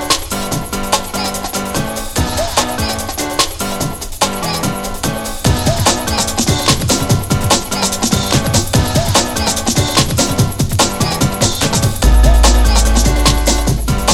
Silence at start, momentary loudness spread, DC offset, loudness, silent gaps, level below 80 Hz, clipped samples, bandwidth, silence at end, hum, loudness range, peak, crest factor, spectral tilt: 0 s; 7 LU; under 0.1%; -14 LUFS; none; -18 dBFS; under 0.1%; 16.5 kHz; 0 s; none; 4 LU; 0 dBFS; 14 dB; -3.5 dB/octave